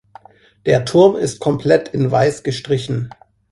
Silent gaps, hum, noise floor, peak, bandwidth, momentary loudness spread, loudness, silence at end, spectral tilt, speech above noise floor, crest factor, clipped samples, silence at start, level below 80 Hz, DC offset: none; none; -44 dBFS; 0 dBFS; 11.5 kHz; 12 LU; -16 LUFS; 0.45 s; -6.5 dB/octave; 29 dB; 16 dB; under 0.1%; 0.65 s; -50 dBFS; under 0.1%